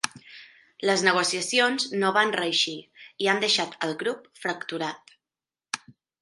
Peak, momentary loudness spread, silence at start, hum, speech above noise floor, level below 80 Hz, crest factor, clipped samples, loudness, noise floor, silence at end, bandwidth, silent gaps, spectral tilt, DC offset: -4 dBFS; 14 LU; 0.05 s; none; over 65 dB; -78 dBFS; 24 dB; under 0.1%; -25 LUFS; under -90 dBFS; 0.3 s; 11.5 kHz; none; -2 dB/octave; under 0.1%